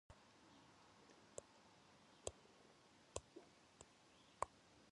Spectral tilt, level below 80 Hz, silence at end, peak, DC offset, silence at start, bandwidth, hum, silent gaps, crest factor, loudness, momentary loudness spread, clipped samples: -3 dB/octave; -76 dBFS; 0 s; -26 dBFS; under 0.1%; 0.1 s; 11 kHz; none; none; 34 dB; -59 LUFS; 17 LU; under 0.1%